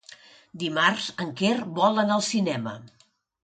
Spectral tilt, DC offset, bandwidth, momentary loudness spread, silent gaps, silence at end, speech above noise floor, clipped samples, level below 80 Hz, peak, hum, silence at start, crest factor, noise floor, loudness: -4 dB/octave; under 0.1%; 9.4 kHz; 10 LU; none; 0.55 s; 26 dB; under 0.1%; -70 dBFS; -6 dBFS; none; 0.1 s; 20 dB; -51 dBFS; -25 LUFS